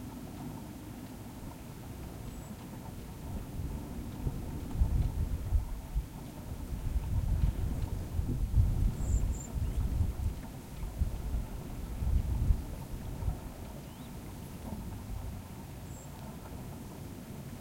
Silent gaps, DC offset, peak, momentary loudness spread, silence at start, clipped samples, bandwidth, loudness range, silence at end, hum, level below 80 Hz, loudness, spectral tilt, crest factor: none; under 0.1%; -14 dBFS; 12 LU; 0 s; under 0.1%; 16.5 kHz; 10 LU; 0 s; none; -38 dBFS; -38 LUFS; -7 dB/octave; 22 dB